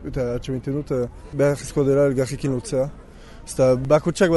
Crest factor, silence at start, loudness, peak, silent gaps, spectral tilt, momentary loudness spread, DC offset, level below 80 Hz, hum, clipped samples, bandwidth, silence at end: 16 dB; 0 s; -22 LUFS; -4 dBFS; none; -6.5 dB/octave; 10 LU; under 0.1%; -40 dBFS; none; under 0.1%; 11.5 kHz; 0 s